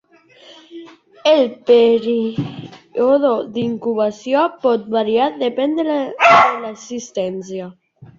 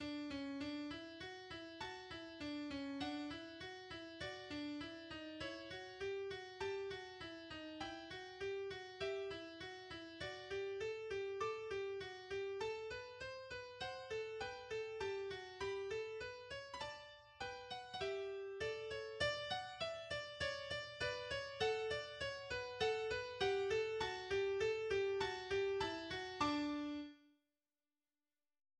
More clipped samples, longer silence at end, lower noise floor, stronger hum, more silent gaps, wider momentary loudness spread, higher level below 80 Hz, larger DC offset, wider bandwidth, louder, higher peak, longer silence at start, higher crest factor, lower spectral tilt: neither; second, 0.15 s vs 1.5 s; second, -46 dBFS vs under -90 dBFS; neither; neither; first, 16 LU vs 11 LU; first, -60 dBFS vs -68 dBFS; neither; second, 7.6 kHz vs 10.5 kHz; first, -16 LUFS vs -45 LUFS; first, 0 dBFS vs -26 dBFS; first, 0.5 s vs 0 s; about the same, 16 dB vs 20 dB; about the same, -5 dB/octave vs -4 dB/octave